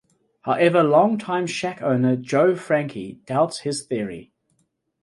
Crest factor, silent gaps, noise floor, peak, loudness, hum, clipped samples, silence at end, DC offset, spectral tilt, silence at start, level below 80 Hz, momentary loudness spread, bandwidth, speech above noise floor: 18 dB; none; -69 dBFS; -4 dBFS; -21 LUFS; none; under 0.1%; 0.8 s; under 0.1%; -6 dB/octave; 0.45 s; -64 dBFS; 14 LU; 11.5 kHz; 49 dB